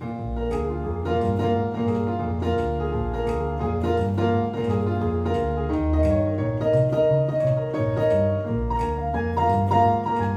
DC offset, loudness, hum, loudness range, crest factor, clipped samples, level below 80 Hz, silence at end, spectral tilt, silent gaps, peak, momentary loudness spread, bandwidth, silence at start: under 0.1%; -23 LUFS; none; 3 LU; 14 dB; under 0.1%; -36 dBFS; 0 s; -9 dB/octave; none; -8 dBFS; 6 LU; 8.8 kHz; 0 s